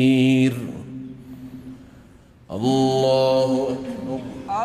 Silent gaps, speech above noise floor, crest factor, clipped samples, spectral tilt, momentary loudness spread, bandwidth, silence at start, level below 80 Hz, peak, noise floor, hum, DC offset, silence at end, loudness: none; 30 dB; 14 dB; under 0.1%; -6.5 dB/octave; 21 LU; 13.5 kHz; 0 s; -54 dBFS; -8 dBFS; -49 dBFS; none; under 0.1%; 0 s; -20 LUFS